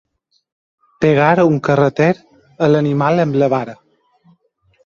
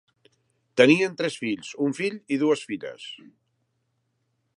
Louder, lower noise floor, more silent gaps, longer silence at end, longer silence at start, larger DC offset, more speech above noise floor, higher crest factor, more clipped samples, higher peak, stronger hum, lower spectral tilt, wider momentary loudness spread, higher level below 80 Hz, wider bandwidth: first, -15 LUFS vs -24 LUFS; second, -59 dBFS vs -74 dBFS; neither; second, 1.1 s vs 1.4 s; first, 1 s vs 0.75 s; neither; second, 45 dB vs 50 dB; second, 16 dB vs 24 dB; neither; about the same, 0 dBFS vs -2 dBFS; neither; first, -8 dB/octave vs -5 dB/octave; second, 7 LU vs 20 LU; first, -54 dBFS vs -76 dBFS; second, 7.2 kHz vs 11.5 kHz